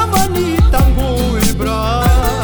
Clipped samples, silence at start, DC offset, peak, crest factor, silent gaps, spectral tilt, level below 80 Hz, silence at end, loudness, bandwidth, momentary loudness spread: under 0.1%; 0 s; under 0.1%; 0 dBFS; 12 dB; none; -5.5 dB/octave; -16 dBFS; 0 s; -14 LUFS; over 20 kHz; 4 LU